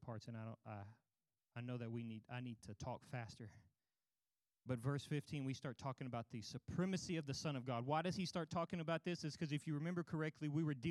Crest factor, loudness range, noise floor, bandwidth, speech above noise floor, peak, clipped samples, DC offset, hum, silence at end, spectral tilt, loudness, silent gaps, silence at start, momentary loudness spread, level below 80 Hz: 20 dB; 8 LU; under -90 dBFS; 12.5 kHz; over 45 dB; -26 dBFS; under 0.1%; under 0.1%; none; 0 s; -6 dB/octave; -46 LUFS; none; 0 s; 11 LU; -78 dBFS